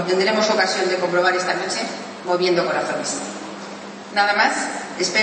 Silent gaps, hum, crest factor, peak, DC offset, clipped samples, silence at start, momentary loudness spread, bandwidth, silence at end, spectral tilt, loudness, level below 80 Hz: none; none; 16 dB; -4 dBFS; under 0.1%; under 0.1%; 0 s; 13 LU; 8.8 kHz; 0 s; -3 dB/octave; -20 LUFS; -74 dBFS